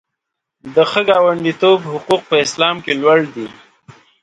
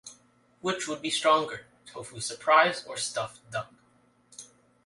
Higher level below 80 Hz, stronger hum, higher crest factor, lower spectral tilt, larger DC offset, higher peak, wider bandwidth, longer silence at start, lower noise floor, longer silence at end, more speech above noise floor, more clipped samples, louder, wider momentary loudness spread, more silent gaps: first, -60 dBFS vs -72 dBFS; neither; second, 16 dB vs 22 dB; first, -4 dB/octave vs -2.5 dB/octave; neither; first, 0 dBFS vs -8 dBFS; about the same, 11 kHz vs 11.5 kHz; first, 0.65 s vs 0.05 s; first, -78 dBFS vs -64 dBFS; first, 0.7 s vs 0.4 s; first, 64 dB vs 37 dB; neither; first, -14 LUFS vs -27 LUFS; second, 6 LU vs 25 LU; neither